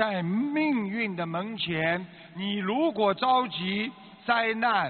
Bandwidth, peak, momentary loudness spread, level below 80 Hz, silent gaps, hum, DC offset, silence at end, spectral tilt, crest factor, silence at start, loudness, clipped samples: 4.6 kHz; -8 dBFS; 8 LU; -68 dBFS; none; none; under 0.1%; 0 s; -3 dB/octave; 18 dB; 0 s; -27 LUFS; under 0.1%